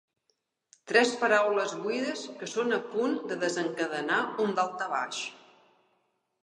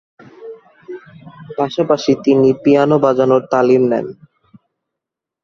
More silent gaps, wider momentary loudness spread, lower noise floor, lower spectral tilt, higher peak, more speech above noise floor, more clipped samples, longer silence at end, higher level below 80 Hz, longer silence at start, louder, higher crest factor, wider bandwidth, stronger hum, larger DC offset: neither; second, 10 LU vs 22 LU; second, -77 dBFS vs -83 dBFS; second, -3.5 dB/octave vs -7 dB/octave; second, -8 dBFS vs -2 dBFS; second, 49 dB vs 68 dB; neither; second, 1.05 s vs 1.3 s; second, -86 dBFS vs -56 dBFS; first, 0.85 s vs 0.4 s; second, -29 LUFS vs -14 LUFS; first, 22 dB vs 14 dB; first, 11 kHz vs 7.2 kHz; neither; neither